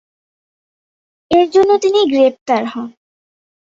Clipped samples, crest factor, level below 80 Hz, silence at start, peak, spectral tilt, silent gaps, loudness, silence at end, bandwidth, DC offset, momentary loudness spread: under 0.1%; 14 dB; -56 dBFS; 1.3 s; -2 dBFS; -4.5 dB/octave; 2.41-2.46 s; -13 LUFS; 0.9 s; 7.8 kHz; under 0.1%; 14 LU